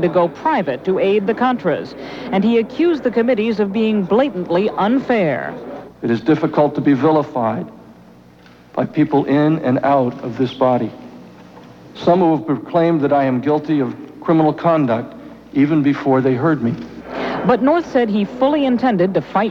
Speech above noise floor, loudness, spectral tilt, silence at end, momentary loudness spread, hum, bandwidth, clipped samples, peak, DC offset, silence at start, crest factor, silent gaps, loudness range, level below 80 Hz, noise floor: 29 dB; -17 LUFS; -8.5 dB/octave; 0 s; 9 LU; none; 7 kHz; under 0.1%; -2 dBFS; under 0.1%; 0 s; 14 dB; none; 2 LU; -54 dBFS; -45 dBFS